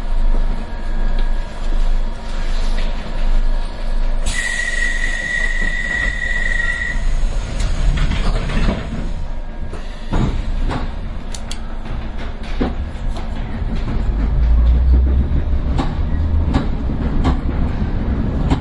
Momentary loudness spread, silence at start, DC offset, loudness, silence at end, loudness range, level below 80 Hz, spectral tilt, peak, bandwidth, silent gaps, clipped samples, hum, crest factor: 10 LU; 0 s; under 0.1%; -21 LUFS; 0 s; 7 LU; -18 dBFS; -5.5 dB/octave; -2 dBFS; 11 kHz; none; under 0.1%; none; 14 dB